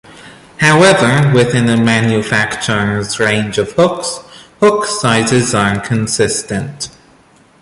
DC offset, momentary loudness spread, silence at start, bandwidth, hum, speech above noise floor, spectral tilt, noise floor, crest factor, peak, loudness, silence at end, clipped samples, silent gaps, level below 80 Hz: under 0.1%; 12 LU; 0.1 s; 11.5 kHz; none; 35 dB; -4.5 dB/octave; -47 dBFS; 14 dB; 0 dBFS; -12 LUFS; 0.75 s; under 0.1%; none; -44 dBFS